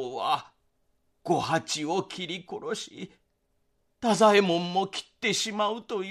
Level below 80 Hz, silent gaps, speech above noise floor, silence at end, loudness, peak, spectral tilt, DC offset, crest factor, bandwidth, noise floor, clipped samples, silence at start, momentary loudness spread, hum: -70 dBFS; none; 46 dB; 0 s; -27 LUFS; -8 dBFS; -4 dB/octave; under 0.1%; 20 dB; 14 kHz; -73 dBFS; under 0.1%; 0 s; 15 LU; none